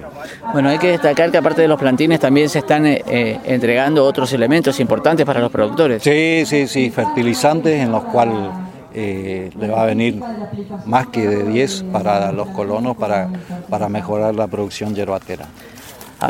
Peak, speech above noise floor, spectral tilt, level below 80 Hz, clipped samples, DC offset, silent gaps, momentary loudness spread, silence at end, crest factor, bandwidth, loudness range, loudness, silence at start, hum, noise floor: 0 dBFS; 20 dB; -6 dB/octave; -52 dBFS; under 0.1%; under 0.1%; none; 13 LU; 0 s; 16 dB; 17 kHz; 6 LU; -16 LUFS; 0 s; none; -36 dBFS